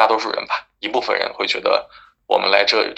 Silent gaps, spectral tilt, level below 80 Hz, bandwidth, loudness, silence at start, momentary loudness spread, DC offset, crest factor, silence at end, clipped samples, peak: none; -2 dB/octave; -62 dBFS; 8.4 kHz; -19 LUFS; 0 s; 9 LU; under 0.1%; 20 dB; 0 s; under 0.1%; 0 dBFS